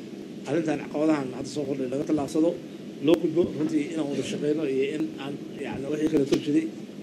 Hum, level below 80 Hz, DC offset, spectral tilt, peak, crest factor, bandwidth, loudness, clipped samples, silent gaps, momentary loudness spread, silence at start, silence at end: none; -64 dBFS; under 0.1%; -6 dB/octave; -8 dBFS; 18 dB; 12.5 kHz; -27 LUFS; under 0.1%; none; 11 LU; 0 s; 0 s